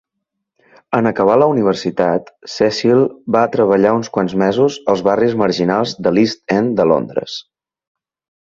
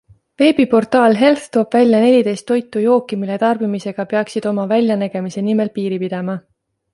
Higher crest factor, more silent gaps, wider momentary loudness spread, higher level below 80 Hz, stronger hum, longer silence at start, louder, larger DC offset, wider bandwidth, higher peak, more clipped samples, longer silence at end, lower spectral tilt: about the same, 14 dB vs 14 dB; neither; second, 7 LU vs 10 LU; first, -54 dBFS vs -62 dBFS; neither; first, 0.9 s vs 0.4 s; about the same, -15 LUFS vs -16 LUFS; neither; second, 7.8 kHz vs 11.5 kHz; about the same, 0 dBFS vs -2 dBFS; neither; first, 1.05 s vs 0.55 s; about the same, -6 dB/octave vs -6.5 dB/octave